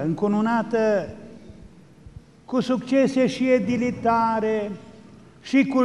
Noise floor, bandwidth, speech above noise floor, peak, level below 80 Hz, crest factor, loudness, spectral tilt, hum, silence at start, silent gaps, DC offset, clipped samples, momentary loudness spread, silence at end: -47 dBFS; 10.5 kHz; 26 dB; -8 dBFS; -56 dBFS; 16 dB; -22 LUFS; -6.5 dB/octave; none; 0 s; none; 0.2%; under 0.1%; 15 LU; 0 s